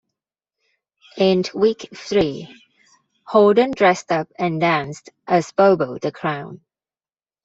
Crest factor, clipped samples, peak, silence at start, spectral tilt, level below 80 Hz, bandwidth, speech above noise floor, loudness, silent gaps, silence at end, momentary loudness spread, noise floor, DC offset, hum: 18 dB; under 0.1%; -2 dBFS; 1.15 s; -6 dB/octave; -58 dBFS; 8 kHz; over 72 dB; -19 LUFS; none; 0.9 s; 15 LU; under -90 dBFS; under 0.1%; none